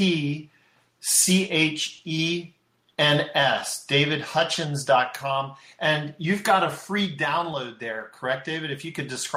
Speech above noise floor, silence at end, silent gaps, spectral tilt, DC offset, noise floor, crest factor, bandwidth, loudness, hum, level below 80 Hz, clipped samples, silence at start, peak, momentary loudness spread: 38 dB; 0 s; none; -3 dB/octave; under 0.1%; -62 dBFS; 20 dB; 16 kHz; -24 LUFS; none; -66 dBFS; under 0.1%; 0 s; -6 dBFS; 12 LU